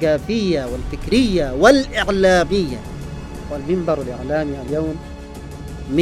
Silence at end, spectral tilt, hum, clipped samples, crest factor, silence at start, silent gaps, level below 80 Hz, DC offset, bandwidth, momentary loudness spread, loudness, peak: 0 s; -5.5 dB/octave; none; under 0.1%; 18 dB; 0 s; none; -32 dBFS; under 0.1%; 15 kHz; 18 LU; -18 LUFS; 0 dBFS